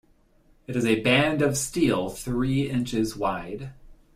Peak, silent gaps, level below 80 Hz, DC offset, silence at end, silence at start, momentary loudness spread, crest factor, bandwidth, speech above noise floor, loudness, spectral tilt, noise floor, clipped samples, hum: -6 dBFS; none; -46 dBFS; under 0.1%; 0.25 s; 0.7 s; 13 LU; 18 dB; 16 kHz; 35 dB; -25 LUFS; -5 dB/octave; -60 dBFS; under 0.1%; none